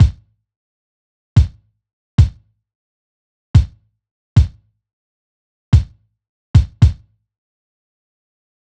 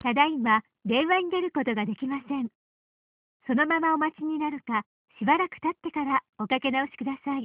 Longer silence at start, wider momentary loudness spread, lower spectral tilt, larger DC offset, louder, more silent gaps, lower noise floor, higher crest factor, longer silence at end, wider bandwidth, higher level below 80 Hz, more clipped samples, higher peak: about the same, 0 s vs 0.05 s; about the same, 7 LU vs 8 LU; first, -8 dB/octave vs -2.5 dB/octave; neither; first, -16 LUFS vs -27 LUFS; first, 0.56-1.36 s, 1.93-2.18 s, 2.75-3.54 s, 4.11-4.36 s, 4.93-5.72 s, 6.29-6.54 s vs 2.55-3.40 s, 4.86-5.05 s, 6.29-6.33 s; second, -29 dBFS vs under -90 dBFS; about the same, 18 dB vs 20 dB; first, 1.8 s vs 0 s; first, 8.4 kHz vs 4 kHz; first, -24 dBFS vs -68 dBFS; neither; first, 0 dBFS vs -8 dBFS